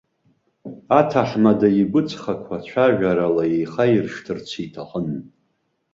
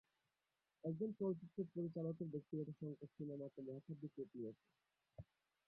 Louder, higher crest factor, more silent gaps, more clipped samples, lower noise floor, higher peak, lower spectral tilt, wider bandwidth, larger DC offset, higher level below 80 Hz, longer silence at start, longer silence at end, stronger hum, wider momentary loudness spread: first, -20 LUFS vs -49 LUFS; about the same, 18 dB vs 16 dB; neither; neither; second, -70 dBFS vs under -90 dBFS; first, -2 dBFS vs -32 dBFS; second, -7.5 dB/octave vs -12 dB/octave; first, 7.6 kHz vs 5 kHz; neither; first, -56 dBFS vs -82 dBFS; second, 0.65 s vs 0.85 s; first, 0.65 s vs 0.45 s; neither; second, 14 LU vs 18 LU